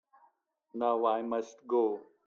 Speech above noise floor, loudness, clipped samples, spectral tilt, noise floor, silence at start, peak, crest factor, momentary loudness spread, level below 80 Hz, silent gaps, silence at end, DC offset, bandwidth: 39 dB; -32 LUFS; under 0.1%; -5.5 dB/octave; -70 dBFS; 0.75 s; -16 dBFS; 18 dB; 7 LU; -82 dBFS; none; 0.25 s; under 0.1%; 7.2 kHz